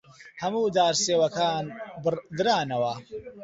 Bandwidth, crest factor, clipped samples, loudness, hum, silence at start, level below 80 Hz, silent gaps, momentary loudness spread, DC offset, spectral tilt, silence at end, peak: 8 kHz; 18 dB; under 0.1%; -26 LUFS; none; 0.2 s; -64 dBFS; none; 11 LU; under 0.1%; -3.5 dB/octave; 0 s; -10 dBFS